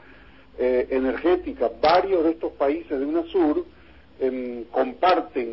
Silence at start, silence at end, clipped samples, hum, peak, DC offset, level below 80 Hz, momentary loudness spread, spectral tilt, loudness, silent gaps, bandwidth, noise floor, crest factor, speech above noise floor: 0.55 s; 0 s; under 0.1%; none; -6 dBFS; 0.2%; -50 dBFS; 9 LU; -8.5 dB/octave; -23 LUFS; none; 5.8 kHz; -50 dBFS; 18 dB; 27 dB